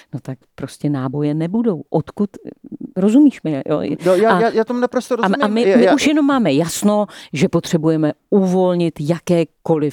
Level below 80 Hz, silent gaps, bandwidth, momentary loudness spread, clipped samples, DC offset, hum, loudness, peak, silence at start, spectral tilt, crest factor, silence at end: -58 dBFS; none; 19 kHz; 11 LU; under 0.1%; under 0.1%; none; -16 LUFS; 0 dBFS; 0.15 s; -6 dB/octave; 16 dB; 0 s